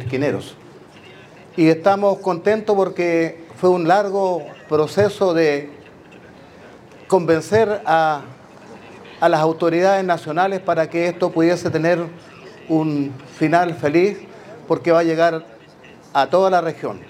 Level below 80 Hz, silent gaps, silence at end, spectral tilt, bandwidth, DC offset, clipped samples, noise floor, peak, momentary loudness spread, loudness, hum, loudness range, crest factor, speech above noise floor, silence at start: -64 dBFS; none; 0.05 s; -6.5 dB/octave; 13.5 kHz; under 0.1%; under 0.1%; -44 dBFS; 0 dBFS; 11 LU; -18 LUFS; none; 2 LU; 18 dB; 26 dB; 0 s